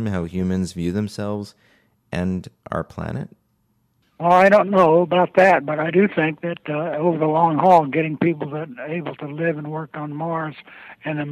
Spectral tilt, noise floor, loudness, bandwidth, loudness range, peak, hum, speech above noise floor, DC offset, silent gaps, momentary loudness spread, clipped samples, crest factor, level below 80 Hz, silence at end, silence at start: -7.5 dB/octave; -66 dBFS; -20 LUFS; 12.5 kHz; 10 LU; -4 dBFS; none; 46 dB; under 0.1%; none; 16 LU; under 0.1%; 16 dB; -48 dBFS; 0 s; 0 s